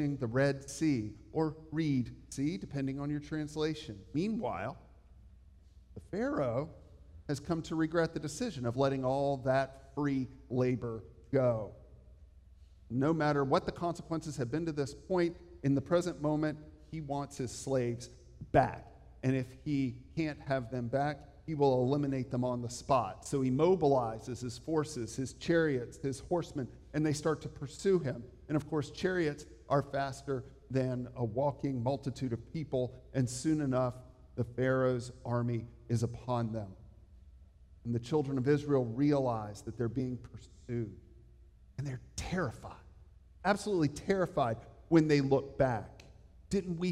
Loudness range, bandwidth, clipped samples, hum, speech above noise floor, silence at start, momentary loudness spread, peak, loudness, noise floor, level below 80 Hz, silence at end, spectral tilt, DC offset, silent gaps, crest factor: 6 LU; 13 kHz; under 0.1%; none; 25 dB; 0 s; 12 LU; -12 dBFS; -34 LUFS; -58 dBFS; -58 dBFS; 0 s; -6.5 dB/octave; under 0.1%; none; 22 dB